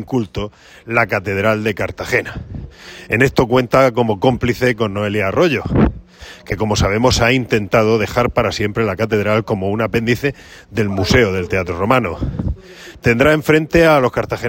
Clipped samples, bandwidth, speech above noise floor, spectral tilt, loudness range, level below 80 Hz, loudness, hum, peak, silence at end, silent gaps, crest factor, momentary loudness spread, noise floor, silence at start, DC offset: under 0.1%; 16.5 kHz; 21 dB; -6 dB/octave; 3 LU; -34 dBFS; -16 LUFS; none; 0 dBFS; 0 s; none; 16 dB; 13 LU; -37 dBFS; 0 s; under 0.1%